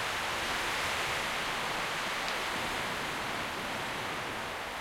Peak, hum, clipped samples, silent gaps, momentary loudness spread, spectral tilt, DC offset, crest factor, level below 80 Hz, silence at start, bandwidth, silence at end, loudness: -18 dBFS; none; under 0.1%; none; 4 LU; -2 dB/octave; under 0.1%; 16 dB; -56 dBFS; 0 s; 16.5 kHz; 0 s; -33 LUFS